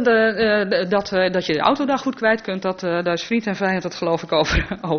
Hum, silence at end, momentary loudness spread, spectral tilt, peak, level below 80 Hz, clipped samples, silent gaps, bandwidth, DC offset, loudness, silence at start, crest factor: none; 0 s; 5 LU; -3.5 dB/octave; 0 dBFS; -38 dBFS; under 0.1%; none; 6.6 kHz; under 0.1%; -20 LUFS; 0 s; 18 dB